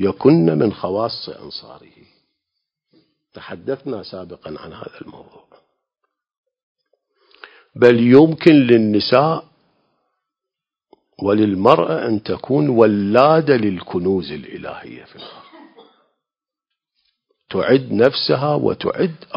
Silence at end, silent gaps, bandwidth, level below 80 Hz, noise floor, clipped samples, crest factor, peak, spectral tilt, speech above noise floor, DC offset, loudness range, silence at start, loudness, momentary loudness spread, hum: 0 s; 6.38-6.44 s, 6.63-6.75 s; 8 kHz; -54 dBFS; -87 dBFS; under 0.1%; 18 dB; 0 dBFS; -8.5 dB/octave; 71 dB; under 0.1%; 18 LU; 0 s; -15 LUFS; 22 LU; none